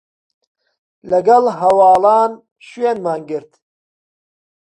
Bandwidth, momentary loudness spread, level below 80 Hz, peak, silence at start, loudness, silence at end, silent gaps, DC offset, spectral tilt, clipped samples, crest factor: 10.5 kHz; 13 LU; -60 dBFS; 0 dBFS; 1.05 s; -14 LUFS; 1.35 s; 2.52-2.56 s; under 0.1%; -6 dB/octave; under 0.1%; 16 dB